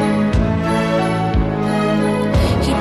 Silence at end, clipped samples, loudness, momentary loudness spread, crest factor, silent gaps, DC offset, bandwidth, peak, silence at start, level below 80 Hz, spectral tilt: 0 s; under 0.1%; -17 LUFS; 2 LU; 12 dB; none; under 0.1%; 13 kHz; -4 dBFS; 0 s; -26 dBFS; -7 dB/octave